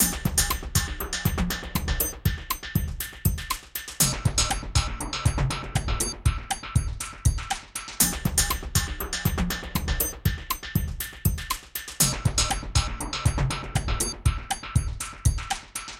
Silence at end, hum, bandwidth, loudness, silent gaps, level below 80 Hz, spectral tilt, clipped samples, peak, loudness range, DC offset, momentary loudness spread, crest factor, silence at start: 0 s; none; 17 kHz; -27 LUFS; none; -32 dBFS; -3 dB/octave; under 0.1%; -4 dBFS; 2 LU; under 0.1%; 8 LU; 22 dB; 0 s